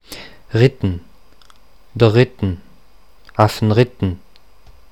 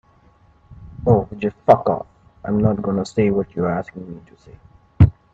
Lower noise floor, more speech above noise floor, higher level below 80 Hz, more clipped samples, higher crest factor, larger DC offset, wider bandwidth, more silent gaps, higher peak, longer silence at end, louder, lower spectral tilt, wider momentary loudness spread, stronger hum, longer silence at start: about the same, -51 dBFS vs -53 dBFS; about the same, 36 dB vs 34 dB; second, -44 dBFS vs -38 dBFS; neither; about the same, 18 dB vs 20 dB; first, 0.8% vs under 0.1%; first, 15.5 kHz vs 8 kHz; neither; about the same, 0 dBFS vs 0 dBFS; first, 0.75 s vs 0.25 s; about the same, -17 LUFS vs -19 LUFS; second, -7.5 dB/octave vs -9 dB/octave; about the same, 20 LU vs 20 LU; neither; second, 0.1 s vs 0.7 s